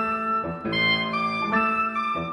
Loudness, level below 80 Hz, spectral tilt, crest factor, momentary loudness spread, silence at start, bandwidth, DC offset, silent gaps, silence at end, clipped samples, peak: -23 LUFS; -54 dBFS; -5.5 dB/octave; 14 dB; 5 LU; 0 s; 11 kHz; under 0.1%; none; 0 s; under 0.1%; -12 dBFS